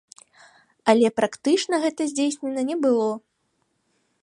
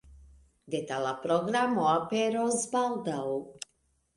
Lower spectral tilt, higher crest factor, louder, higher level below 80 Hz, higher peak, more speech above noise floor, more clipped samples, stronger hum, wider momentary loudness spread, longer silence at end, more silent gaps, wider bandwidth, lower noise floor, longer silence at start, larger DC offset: about the same, -4 dB/octave vs -4 dB/octave; about the same, 20 dB vs 18 dB; first, -22 LUFS vs -29 LUFS; second, -74 dBFS vs -64 dBFS; first, -4 dBFS vs -12 dBFS; first, 50 dB vs 44 dB; neither; neither; about the same, 8 LU vs 10 LU; first, 1.05 s vs 0.5 s; neither; about the same, 11.5 kHz vs 11.5 kHz; about the same, -71 dBFS vs -73 dBFS; first, 0.85 s vs 0.1 s; neither